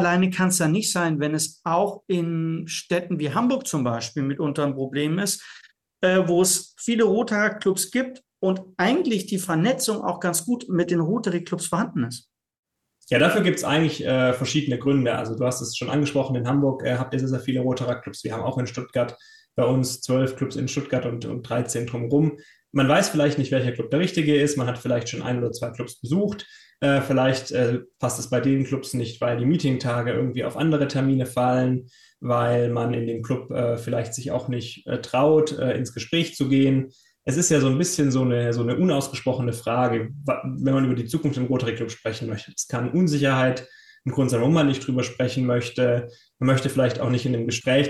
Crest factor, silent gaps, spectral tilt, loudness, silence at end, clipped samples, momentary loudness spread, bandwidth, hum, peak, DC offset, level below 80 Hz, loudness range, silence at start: 18 dB; 12.59-12.63 s; -5.5 dB/octave; -23 LUFS; 0 s; under 0.1%; 8 LU; 12.5 kHz; none; -6 dBFS; under 0.1%; -62 dBFS; 3 LU; 0 s